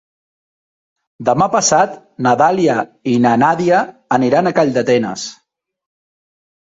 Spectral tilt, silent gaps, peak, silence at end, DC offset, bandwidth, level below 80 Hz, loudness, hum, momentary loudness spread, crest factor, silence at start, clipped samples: -4.5 dB/octave; none; -2 dBFS; 1.3 s; under 0.1%; 8 kHz; -56 dBFS; -14 LUFS; none; 7 LU; 14 dB; 1.2 s; under 0.1%